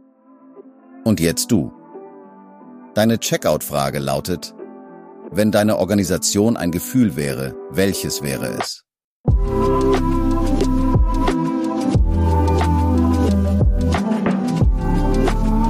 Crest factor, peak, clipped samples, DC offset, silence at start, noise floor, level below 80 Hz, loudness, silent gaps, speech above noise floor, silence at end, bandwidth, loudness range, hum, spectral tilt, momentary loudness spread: 16 dB; -2 dBFS; under 0.1%; under 0.1%; 0.55 s; -48 dBFS; -24 dBFS; -19 LUFS; 9.04-9.24 s; 30 dB; 0 s; 15.5 kHz; 4 LU; none; -5.5 dB/octave; 10 LU